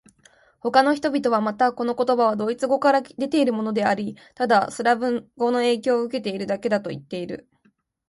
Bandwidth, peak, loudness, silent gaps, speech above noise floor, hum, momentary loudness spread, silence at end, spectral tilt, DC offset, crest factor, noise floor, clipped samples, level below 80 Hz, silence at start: 11.5 kHz; -2 dBFS; -22 LUFS; none; 43 dB; none; 12 LU; 0.7 s; -5 dB/octave; under 0.1%; 20 dB; -64 dBFS; under 0.1%; -66 dBFS; 0.65 s